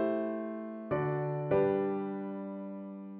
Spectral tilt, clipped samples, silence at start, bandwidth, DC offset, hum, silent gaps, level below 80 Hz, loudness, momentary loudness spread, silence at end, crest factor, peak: -8.5 dB/octave; under 0.1%; 0 s; 4.2 kHz; under 0.1%; none; none; -68 dBFS; -34 LUFS; 12 LU; 0 s; 16 dB; -16 dBFS